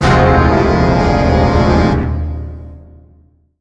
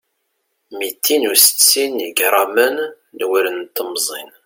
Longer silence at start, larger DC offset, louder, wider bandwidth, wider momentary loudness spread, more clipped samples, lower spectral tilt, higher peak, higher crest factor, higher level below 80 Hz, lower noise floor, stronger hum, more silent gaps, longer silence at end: second, 0 s vs 0.7 s; neither; first, -12 LUFS vs -15 LUFS; second, 9.2 kHz vs 17 kHz; about the same, 15 LU vs 16 LU; neither; first, -7.5 dB/octave vs 1 dB/octave; about the same, 0 dBFS vs 0 dBFS; second, 12 dB vs 18 dB; first, -20 dBFS vs -70 dBFS; second, -49 dBFS vs -70 dBFS; neither; neither; first, 0.8 s vs 0.2 s